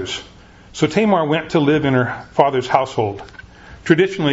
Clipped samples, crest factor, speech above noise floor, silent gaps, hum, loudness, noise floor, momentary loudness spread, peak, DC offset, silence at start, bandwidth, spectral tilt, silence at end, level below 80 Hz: under 0.1%; 18 dB; 27 dB; none; none; -17 LUFS; -43 dBFS; 15 LU; 0 dBFS; under 0.1%; 0 s; 8 kHz; -6 dB/octave; 0 s; -48 dBFS